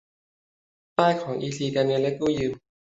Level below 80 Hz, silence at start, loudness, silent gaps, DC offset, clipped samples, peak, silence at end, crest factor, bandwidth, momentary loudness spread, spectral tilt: -58 dBFS; 1 s; -25 LUFS; none; under 0.1%; under 0.1%; -4 dBFS; 0.3 s; 22 dB; 8 kHz; 7 LU; -6 dB/octave